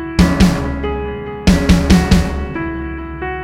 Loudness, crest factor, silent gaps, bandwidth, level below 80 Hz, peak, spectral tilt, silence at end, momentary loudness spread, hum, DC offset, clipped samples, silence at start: -15 LUFS; 14 dB; none; 15.5 kHz; -20 dBFS; 0 dBFS; -6 dB/octave; 0 s; 13 LU; none; under 0.1%; under 0.1%; 0 s